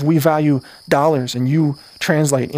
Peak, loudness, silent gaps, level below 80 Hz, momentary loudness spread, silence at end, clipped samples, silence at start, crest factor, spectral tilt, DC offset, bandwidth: 0 dBFS; -17 LUFS; none; -56 dBFS; 6 LU; 0 s; under 0.1%; 0 s; 16 dB; -6 dB/octave; under 0.1%; 16 kHz